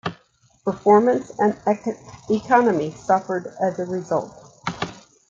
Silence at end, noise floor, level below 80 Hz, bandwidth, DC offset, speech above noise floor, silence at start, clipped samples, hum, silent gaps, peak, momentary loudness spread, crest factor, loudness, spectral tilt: 0.3 s; -59 dBFS; -60 dBFS; 7.6 kHz; under 0.1%; 39 dB; 0.05 s; under 0.1%; none; none; -2 dBFS; 15 LU; 20 dB; -22 LUFS; -6.5 dB/octave